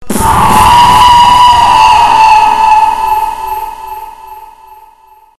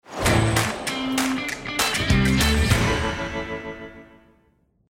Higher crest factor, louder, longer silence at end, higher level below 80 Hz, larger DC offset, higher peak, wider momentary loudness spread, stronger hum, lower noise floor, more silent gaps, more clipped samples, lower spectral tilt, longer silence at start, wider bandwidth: second, 6 dB vs 18 dB; first, -5 LUFS vs -22 LUFS; second, 0 s vs 0.85 s; about the same, -28 dBFS vs -32 dBFS; neither; first, 0 dBFS vs -6 dBFS; first, 16 LU vs 13 LU; first, 60 Hz at -40 dBFS vs none; second, -40 dBFS vs -63 dBFS; neither; first, 2% vs under 0.1%; second, -3 dB/octave vs -4.5 dB/octave; about the same, 0 s vs 0.1 s; second, 14.5 kHz vs 16.5 kHz